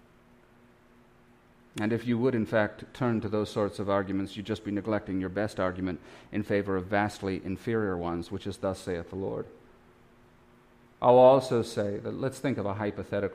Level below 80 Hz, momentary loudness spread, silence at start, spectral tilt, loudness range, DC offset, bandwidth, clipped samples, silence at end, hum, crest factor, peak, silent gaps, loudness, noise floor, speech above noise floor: -60 dBFS; 10 LU; 1.75 s; -7 dB/octave; 7 LU; under 0.1%; 15 kHz; under 0.1%; 0 s; none; 22 dB; -8 dBFS; none; -29 LUFS; -59 dBFS; 31 dB